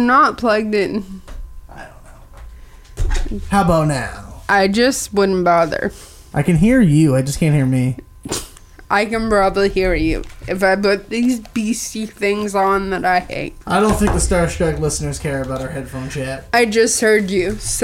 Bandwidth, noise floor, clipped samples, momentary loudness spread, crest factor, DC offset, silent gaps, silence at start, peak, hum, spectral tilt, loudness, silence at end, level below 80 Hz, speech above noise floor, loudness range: 16.5 kHz; -39 dBFS; under 0.1%; 13 LU; 14 dB; under 0.1%; none; 0 s; -2 dBFS; none; -5 dB/octave; -17 LUFS; 0 s; -30 dBFS; 23 dB; 5 LU